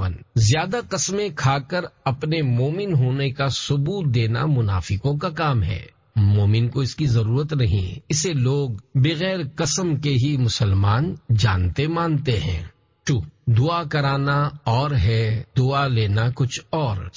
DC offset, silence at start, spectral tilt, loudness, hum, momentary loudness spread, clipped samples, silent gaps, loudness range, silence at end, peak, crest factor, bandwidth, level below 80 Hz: under 0.1%; 0 s; -5.5 dB/octave; -21 LUFS; none; 5 LU; under 0.1%; none; 1 LU; 0.05 s; -8 dBFS; 14 dB; 7.6 kHz; -36 dBFS